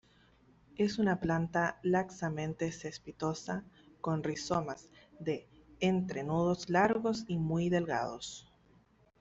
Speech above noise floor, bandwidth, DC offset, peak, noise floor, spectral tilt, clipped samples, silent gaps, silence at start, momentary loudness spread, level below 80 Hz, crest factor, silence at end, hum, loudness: 33 dB; 8 kHz; under 0.1%; -14 dBFS; -66 dBFS; -6 dB/octave; under 0.1%; none; 0.8 s; 12 LU; -62 dBFS; 20 dB; 0.8 s; none; -34 LUFS